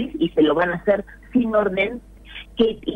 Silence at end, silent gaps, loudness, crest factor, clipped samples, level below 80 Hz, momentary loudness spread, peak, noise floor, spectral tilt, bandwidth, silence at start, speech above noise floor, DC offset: 0 s; none; -21 LUFS; 14 dB; under 0.1%; -46 dBFS; 18 LU; -6 dBFS; -40 dBFS; -7.5 dB/octave; 9 kHz; 0 s; 20 dB; under 0.1%